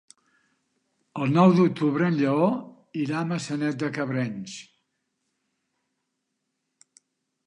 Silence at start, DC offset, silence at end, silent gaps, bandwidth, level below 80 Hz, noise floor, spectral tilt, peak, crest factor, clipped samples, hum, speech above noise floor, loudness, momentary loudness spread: 1.15 s; under 0.1%; 2.85 s; none; 10 kHz; -74 dBFS; -79 dBFS; -7 dB/octave; -6 dBFS; 20 dB; under 0.1%; none; 56 dB; -24 LUFS; 18 LU